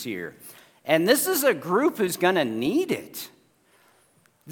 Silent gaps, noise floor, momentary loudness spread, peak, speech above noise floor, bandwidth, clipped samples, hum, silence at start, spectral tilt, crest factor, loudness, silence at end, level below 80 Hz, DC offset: none; -62 dBFS; 18 LU; -4 dBFS; 38 dB; 18 kHz; under 0.1%; none; 0 s; -3.5 dB/octave; 20 dB; -23 LUFS; 0 s; -72 dBFS; under 0.1%